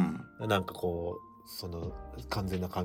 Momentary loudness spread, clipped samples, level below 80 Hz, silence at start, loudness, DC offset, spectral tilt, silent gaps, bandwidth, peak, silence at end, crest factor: 12 LU; under 0.1%; -52 dBFS; 0 s; -35 LUFS; under 0.1%; -6 dB/octave; none; 17.5 kHz; -14 dBFS; 0 s; 22 dB